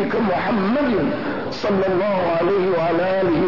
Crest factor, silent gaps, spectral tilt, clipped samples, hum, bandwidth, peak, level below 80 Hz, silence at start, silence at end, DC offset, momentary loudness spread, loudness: 10 dB; none; -7.5 dB/octave; under 0.1%; none; 6 kHz; -10 dBFS; -48 dBFS; 0 s; 0 s; 1%; 4 LU; -20 LUFS